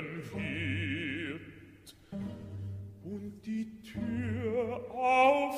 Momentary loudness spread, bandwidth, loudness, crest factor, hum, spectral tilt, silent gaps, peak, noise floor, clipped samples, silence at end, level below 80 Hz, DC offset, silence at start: 18 LU; 15.5 kHz; -34 LUFS; 22 dB; none; -6.5 dB/octave; none; -12 dBFS; -55 dBFS; under 0.1%; 0 s; -62 dBFS; under 0.1%; 0 s